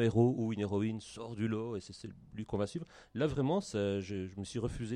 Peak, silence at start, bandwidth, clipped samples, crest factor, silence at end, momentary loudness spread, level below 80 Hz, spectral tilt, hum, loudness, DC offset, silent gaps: -18 dBFS; 0 s; 10.5 kHz; under 0.1%; 18 dB; 0 s; 14 LU; -58 dBFS; -7 dB/octave; none; -36 LUFS; under 0.1%; none